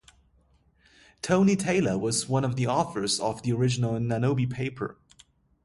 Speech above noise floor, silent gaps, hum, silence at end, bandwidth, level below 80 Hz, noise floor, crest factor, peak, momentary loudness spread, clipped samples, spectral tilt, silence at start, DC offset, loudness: 38 dB; none; none; 0.75 s; 11.5 kHz; -56 dBFS; -64 dBFS; 18 dB; -10 dBFS; 9 LU; under 0.1%; -5.5 dB/octave; 1.25 s; under 0.1%; -26 LUFS